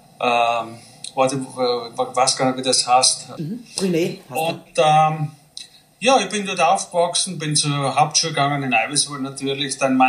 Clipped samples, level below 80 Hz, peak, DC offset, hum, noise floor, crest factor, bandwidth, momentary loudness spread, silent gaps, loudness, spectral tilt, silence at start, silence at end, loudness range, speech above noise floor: under 0.1%; -66 dBFS; -2 dBFS; under 0.1%; none; -41 dBFS; 18 dB; 15.5 kHz; 12 LU; none; -19 LUFS; -3 dB/octave; 0.2 s; 0 s; 1 LU; 22 dB